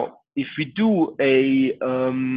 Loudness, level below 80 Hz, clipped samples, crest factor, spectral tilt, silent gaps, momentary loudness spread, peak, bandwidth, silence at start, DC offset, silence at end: -21 LUFS; -66 dBFS; under 0.1%; 14 dB; -9.5 dB/octave; none; 11 LU; -6 dBFS; 5 kHz; 0 s; under 0.1%; 0 s